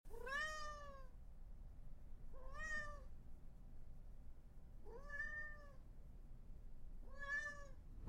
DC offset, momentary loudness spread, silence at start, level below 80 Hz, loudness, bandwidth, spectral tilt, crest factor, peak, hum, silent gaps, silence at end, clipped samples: under 0.1%; 18 LU; 0.05 s; -56 dBFS; -50 LUFS; 12.5 kHz; -3.5 dB/octave; 16 dB; -34 dBFS; none; none; 0 s; under 0.1%